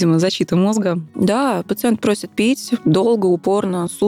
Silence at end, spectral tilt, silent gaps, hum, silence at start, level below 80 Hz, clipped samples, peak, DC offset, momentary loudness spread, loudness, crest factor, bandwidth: 0 s; -6 dB/octave; none; none; 0 s; -58 dBFS; under 0.1%; -6 dBFS; under 0.1%; 4 LU; -17 LUFS; 10 dB; 16 kHz